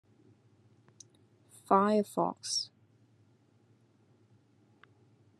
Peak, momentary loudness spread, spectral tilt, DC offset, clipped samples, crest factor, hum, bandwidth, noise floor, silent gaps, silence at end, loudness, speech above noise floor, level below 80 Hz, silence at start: -12 dBFS; 8 LU; -4.5 dB/octave; under 0.1%; under 0.1%; 26 dB; none; 13 kHz; -66 dBFS; none; 2.75 s; -30 LUFS; 37 dB; -88 dBFS; 1.7 s